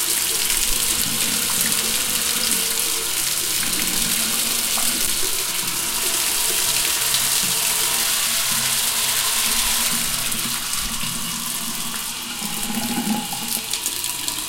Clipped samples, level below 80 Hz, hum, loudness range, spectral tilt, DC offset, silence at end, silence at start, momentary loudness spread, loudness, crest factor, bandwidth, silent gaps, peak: under 0.1%; -42 dBFS; none; 6 LU; 0 dB/octave; under 0.1%; 0 s; 0 s; 6 LU; -19 LUFS; 18 dB; 17 kHz; none; -4 dBFS